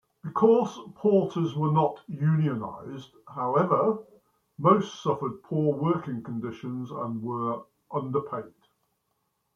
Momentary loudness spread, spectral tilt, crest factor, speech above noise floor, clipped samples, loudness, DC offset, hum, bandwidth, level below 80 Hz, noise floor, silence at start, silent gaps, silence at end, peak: 13 LU; -8.5 dB/octave; 20 dB; 50 dB; under 0.1%; -27 LUFS; under 0.1%; none; 7 kHz; -70 dBFS; -76 dBFS; 0.25 s; none; 1.05 s; -8 dBFS